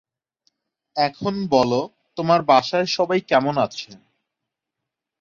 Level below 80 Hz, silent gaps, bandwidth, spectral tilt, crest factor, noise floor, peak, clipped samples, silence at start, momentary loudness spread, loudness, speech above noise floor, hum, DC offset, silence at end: -60 dBFS; none; 7.4 kHz; -5.5 dB/octave; 20 dB; -84 dBFS; -2 dBFS; under 0.1%; 0.95 s; 14 LU; -20 LUFS; 64 dB; none; under 0.1%; 1.25 s